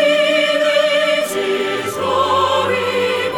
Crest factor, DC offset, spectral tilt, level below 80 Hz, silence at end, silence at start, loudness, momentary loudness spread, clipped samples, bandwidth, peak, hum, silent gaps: 12 dB; under 0.1%; -3 dB/octave; -58 dBFS; 0 s; 0 s; -16 LUFS; 5 LU; under 0.1%; 17.5 kHz; -4 dBFS; none; none